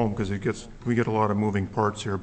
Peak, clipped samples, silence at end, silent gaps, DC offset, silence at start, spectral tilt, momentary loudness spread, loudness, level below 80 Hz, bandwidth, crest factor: -10 dBFS; under 0.1%; 0 s; none; under 0.1%; 0 s; -7 dB/octave; 6 LU; -26 LUFS; -48 dBFS; 8.6 kHz; 16 dB